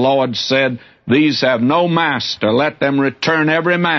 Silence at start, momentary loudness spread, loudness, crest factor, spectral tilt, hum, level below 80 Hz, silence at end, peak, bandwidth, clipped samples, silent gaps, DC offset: 0 s; 3 LU; -15 LUFS; 12 dB; -5.5 dB/octave; none; -58 dBFS; 0 s; -2 dBFS; 6.4 kHz; under 0.1%; none; under 0.1%